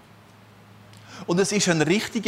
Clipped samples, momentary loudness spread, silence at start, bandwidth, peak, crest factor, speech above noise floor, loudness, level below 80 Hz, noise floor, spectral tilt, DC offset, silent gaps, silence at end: under 0.1%; 17 LU; 1.1 s; 15.5 kHz; -8 dBFS; 18 dB; 28 dB; -22 LUFS; -64 dBFS; -50 dBFS; -4 dB/octave; under 0.1%; none; 0 s